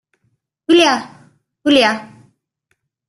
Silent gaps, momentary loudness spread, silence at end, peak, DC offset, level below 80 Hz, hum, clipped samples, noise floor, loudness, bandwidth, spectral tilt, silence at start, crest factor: none; 18 LU; 1.05 s; 0 dBFS; under 0.1%; -60 dBFS; none; under 0.1%; -69 dBFS; -14 LUFS; 12 kHz; -3 dB/octave; 0.7 s; 18 dB